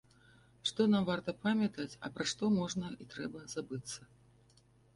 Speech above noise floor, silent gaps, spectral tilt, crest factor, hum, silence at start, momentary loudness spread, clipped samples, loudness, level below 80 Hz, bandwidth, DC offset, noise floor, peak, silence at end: 31 dB; none; -5 dB/octave; 18 dB; 50 Hz at -60 dBFS; 0.65 s; 13 LU; under 0.1%; -36 LUFS; -68 dBFS; 11.5 kHz; under 0.1%; -66 dBFS; -18 dBFS; 0.9 s